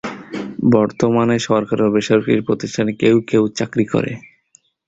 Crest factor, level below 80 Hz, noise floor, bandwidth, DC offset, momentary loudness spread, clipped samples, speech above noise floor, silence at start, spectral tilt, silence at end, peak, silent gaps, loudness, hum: 16 dB; -52 dBFS; -56 dBFS; 8 kHz; under 0.1%; 11 LU; under 0.1%; 40 dB; 0.05 s; -6.5 dB/octave; 0.7 s; -2 dBFS; none; -17 LUFS; none